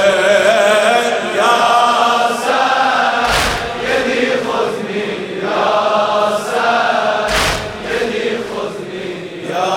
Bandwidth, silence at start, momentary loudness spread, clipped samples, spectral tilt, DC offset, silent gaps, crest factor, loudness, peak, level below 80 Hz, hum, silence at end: 17 kHz; 0 s; 10 LU; under 0.1%; -3 dB/octave; under 0.1%; none; 14 dB; -14 LUFS; 0 dBFS; -38 dBFS; none; 0 s